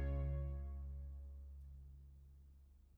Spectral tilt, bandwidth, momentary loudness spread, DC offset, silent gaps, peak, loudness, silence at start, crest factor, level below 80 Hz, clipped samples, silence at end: -10 dB/octave; 3.3 kHz; 22 LU; under 0.1%; none; -32 dBFS; -48 LUFS; 0 s; 14 dB; -48 dBFS; under 0.1%; 0.05 s